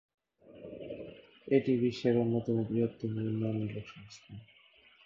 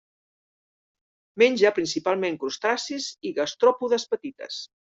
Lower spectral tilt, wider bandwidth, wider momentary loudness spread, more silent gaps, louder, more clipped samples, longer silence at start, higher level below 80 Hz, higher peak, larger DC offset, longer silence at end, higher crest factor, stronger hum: first, -8.5 dB/octave vs -3 dB/octave; about the same, 7.4 kHz vs 8 kHz; first, 22 LU vs 14 LU; neither; second, -32 LUFS vs -24 LUFS; neither; second, 0.45 s vs 1.35 s; about the same, -68 dBFS vs -72 dBFS; second, -14 dBFS vs -6 dBFS; neither; first, 0.6 s vs 0.3 s; about the same, 20 dB vs 20 dB; neither